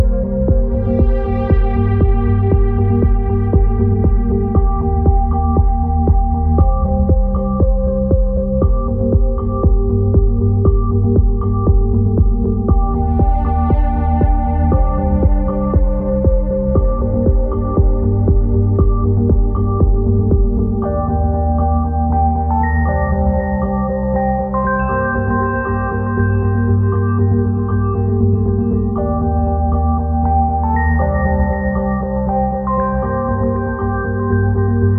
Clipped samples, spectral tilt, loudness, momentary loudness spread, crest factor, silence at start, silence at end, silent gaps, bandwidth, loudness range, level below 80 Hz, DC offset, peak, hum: under 0.1%; -13.5 dB/octave; -16 LUFS; 3 LU; 12 dB; 0 s; 0 s; none; 2.9 kHz; 2 LU; -16 dBFS; under 0.1%; 0 dBFS; none